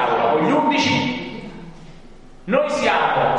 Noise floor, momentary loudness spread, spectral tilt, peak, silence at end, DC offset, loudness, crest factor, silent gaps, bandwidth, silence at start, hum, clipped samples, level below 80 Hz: -41 dBFS; 19 LU; -5 dB/octave; -4 dBFS; 0 s; under 0.1%; -18 LUFS; 16 dB; none; 10.5 kHz; 0 s; none; under 0.1%; -46 dBFS